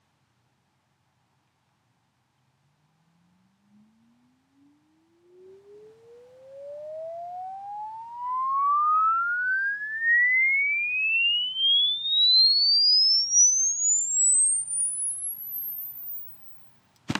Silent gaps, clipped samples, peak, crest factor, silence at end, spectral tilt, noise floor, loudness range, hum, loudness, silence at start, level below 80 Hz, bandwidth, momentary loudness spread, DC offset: none; under 0.1%; -12 dBFS; 14 dB; 0 s; 2 dB/octave; -71 dBFS; 20 LU; none; -20 LUFS; 5.5 s; -76 dBFS; 16 kHz; 21 LU; under 0.1%